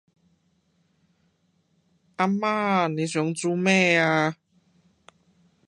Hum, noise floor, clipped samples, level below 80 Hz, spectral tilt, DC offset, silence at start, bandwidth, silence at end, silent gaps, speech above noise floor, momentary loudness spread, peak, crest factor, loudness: none; -68 dBFS; under 0.1%; -74 dBFS; -5 dB/octave; under 0.1%; 2.2 s; 11 kHz; 1.35 s; none; 46 dB; 9 LU; -6 dBFS; 20 dB; -23 LUFS